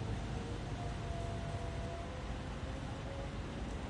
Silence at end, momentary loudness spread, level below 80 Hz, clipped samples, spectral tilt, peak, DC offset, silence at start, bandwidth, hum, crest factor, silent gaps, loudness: 0 s; 2 LU; -46 dBFS; under 0.1%; -6 dB/octave; -28 dBFS; under 0.1%; 0 s; 11 kHz; none; 14 dB; none; -43 LUFS